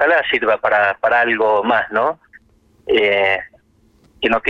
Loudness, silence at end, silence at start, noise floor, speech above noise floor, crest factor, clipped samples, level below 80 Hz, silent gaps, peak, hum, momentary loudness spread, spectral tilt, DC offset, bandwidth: -16 LUFS; 0 s; 0 s; -55 dBFS; 39 dB; 16 dB; under 0.1%; -52 dBFS; none; -2 dBFS; none; 8 LU; -5.5 dB/octave; under 0.1%; 7.4 kHz